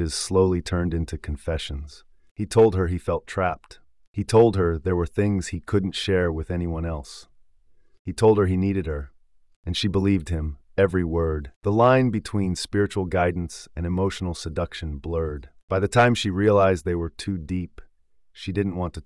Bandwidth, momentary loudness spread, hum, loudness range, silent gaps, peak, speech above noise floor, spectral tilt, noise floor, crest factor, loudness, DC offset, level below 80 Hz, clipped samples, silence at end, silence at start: 12 kHz; 15 LU; none; 3 LU; 2.31-2.36 s, 4.07-4.14 s, 7.99-8.05 s, 9.56-9.63 s, 11.56-11.61 s, 15.63-15.68 s; -6 dBFS; 36 dB; -6 dB/octave; -59 dBFS; 18 dB; -24 LUFS; under 0.1%; -42 dBFS; under 0.1%; 0.05 s; 0 s